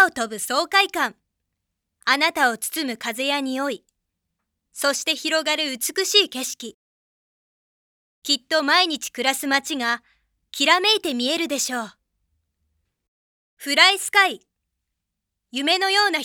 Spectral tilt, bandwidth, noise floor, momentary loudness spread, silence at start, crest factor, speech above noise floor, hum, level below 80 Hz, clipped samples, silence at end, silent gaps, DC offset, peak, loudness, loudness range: 0 dB/octave; over 20 kHz; -81 dBFS; 13 LU; 0 s; 24 dB; 60 dB; none; -72 dBFS; under 0.1%; 0 s; 6.74-8.22 s, 13.08-13.57 s; under 0.1%; 0 dBFS; -20 LUFS; 4 LU